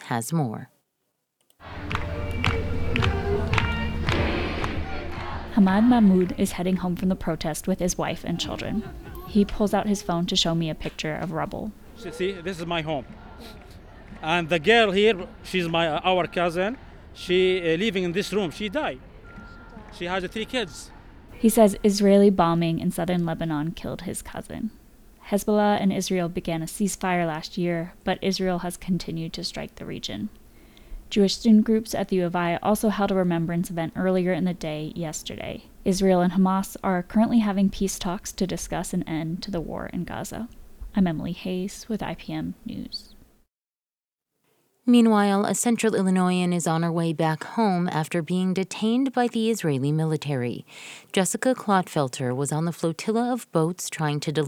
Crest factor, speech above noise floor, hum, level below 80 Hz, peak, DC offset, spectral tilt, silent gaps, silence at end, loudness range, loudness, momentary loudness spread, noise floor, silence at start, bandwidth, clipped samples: 20 dB; over 66 dB; none; -42 dBFS; -4 dBFS; under 0.1%; -5.5 dB/octave; none; 0 s; 7 LU; -24 LUFS; 15 LU; under -90 dBFS; 0 s; 17 kHz; under 0.1%